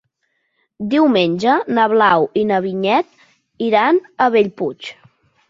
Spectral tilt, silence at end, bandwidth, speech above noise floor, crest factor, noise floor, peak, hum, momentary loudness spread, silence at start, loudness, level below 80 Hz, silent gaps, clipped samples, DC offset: -6.5 dB/octave; 0.55 s; 7.6 kHz; 53 dB; 16 dB; -69 dBFS; -2 dBFS; none; 11 LU; 0.8 s; -16 LUFS; -62 dBFS; none; under 0.1%; under 0.1%